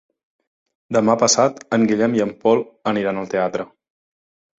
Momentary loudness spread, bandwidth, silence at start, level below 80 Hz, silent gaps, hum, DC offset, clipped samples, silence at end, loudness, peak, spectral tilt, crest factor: 8 LU; 8 kHz; 0.9 s; -60 dBFS; none; none; under 0.1%; under 0.1%; 0.95 s; -19 LUFS; -2 dBFS; -4 dB/octave; 18 dB